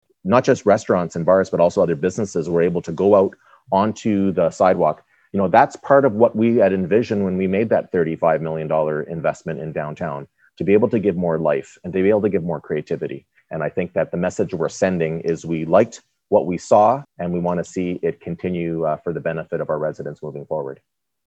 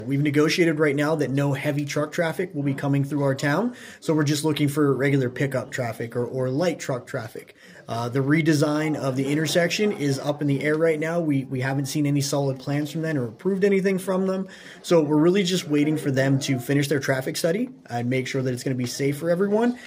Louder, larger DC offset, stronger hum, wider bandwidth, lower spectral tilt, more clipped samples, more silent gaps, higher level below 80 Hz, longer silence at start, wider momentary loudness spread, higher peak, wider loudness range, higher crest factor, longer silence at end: first, -20 LUFS vs -23 LUFS; neither; neither; second, 8.6 kHz vs 16 kHz; about the same, -7 dB/octave vs -6 dB/octave; neither; neither; first, -56 dBFS vs -66 dBFS; first, 0.25 s vs 0 s; first, 11 LU vs 8 LU; first, 0 dBFS vs -8 dBFS; first, 6 LU vs 3 LU; about the same, 20 dB vs 16 dB; first, 0.5 s vs 0 s